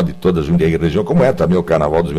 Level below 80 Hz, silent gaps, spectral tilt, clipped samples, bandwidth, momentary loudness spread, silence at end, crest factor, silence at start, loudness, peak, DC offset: -32 dBFS; none; -8.5 dB/octave; under 0.1%; 11 kHz; 3 LU; 0 s; 12 dB; 0 s; -15 LUFS; -2 dBFS; under 0.1%